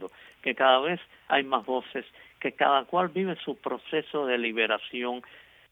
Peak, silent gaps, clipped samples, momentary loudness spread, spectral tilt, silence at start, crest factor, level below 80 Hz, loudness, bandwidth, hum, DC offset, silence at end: -8 dBFS; none; under 0.1%; 12 LU; -6.5 dB/octave; 0 s; 22 dB; -74 dBFS; -27 LUFS; 4 kHz; none; under 0.1%; 0.35 s